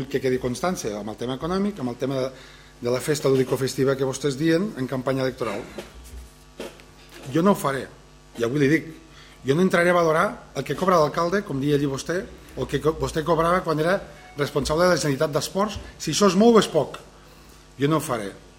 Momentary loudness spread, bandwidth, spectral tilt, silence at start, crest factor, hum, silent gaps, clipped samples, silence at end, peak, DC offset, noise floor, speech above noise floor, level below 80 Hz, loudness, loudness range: 15 LU; 16.5 kHz; -5.5 dB/octave; 0 s; 20 dB; none; none; under 0.1%; 0.2 s; -4 dBFS; under 0.1%; -48 dBFS; 25 dB; -48 dBFS; -23 LUFS; 6 LU